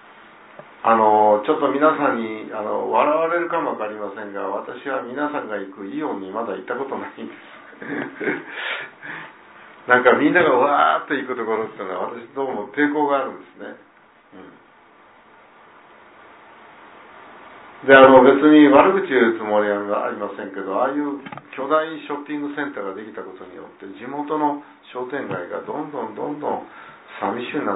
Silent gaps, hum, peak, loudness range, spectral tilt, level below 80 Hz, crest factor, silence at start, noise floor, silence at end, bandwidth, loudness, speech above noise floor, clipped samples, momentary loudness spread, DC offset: none; none; 0 dBFS; 14 LU; -9.5 dB/octave; -64 dBFS; 20 dB; 0.8 s; -50 dBFS; 0 s; 4 kHz; -19 LUFS; 31 dB; under 0.1%; 20 LU; under 0.1%